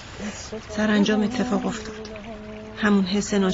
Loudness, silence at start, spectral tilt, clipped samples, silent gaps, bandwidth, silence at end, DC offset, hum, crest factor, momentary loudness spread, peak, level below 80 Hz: -23 LUFS; 0 s; -5 dB/octave; under 0.1%; none; 8 kHz; 0 s; under 0.1%; none; 18 dB; 17 LU; -6 dBFS; -48 dBFS